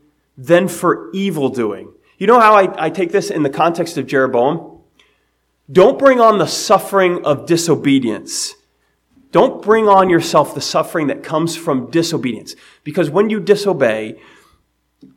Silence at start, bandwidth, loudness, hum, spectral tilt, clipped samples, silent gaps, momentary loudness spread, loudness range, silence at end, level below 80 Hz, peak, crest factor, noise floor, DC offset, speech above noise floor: 0.4 s; 16.5 kHz; -14 LUFS; none; -5 dB/octave; 0.1%; none; 12 LU; 4 LU; 1 s; -58 dBFS; 0 dBFS; 16 dB; -64 dBFS; under 0.1%; 50 dB